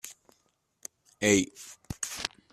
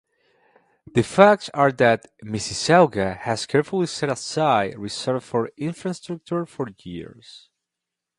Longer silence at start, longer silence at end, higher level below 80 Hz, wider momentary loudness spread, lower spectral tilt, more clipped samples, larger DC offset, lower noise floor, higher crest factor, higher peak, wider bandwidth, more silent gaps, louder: second, 0.05 s vs 0.95 s; second, 0.25 s vs 0.8 s; about the same, -60 dBFS vs -56 dBFS; first, 22 LU vs 16 LU; second, -3 dB/octave vs -5 dB/octave; neither; neither; second, -73 dBFS vs -85 dBFS; about the same, 26 dB vs 22 dB; second, -6 dBFS vs 0 dBFS; first, 15.5 kHz vs 11.5 kHz; neither; second, -29 LUFS vs -21 LUFS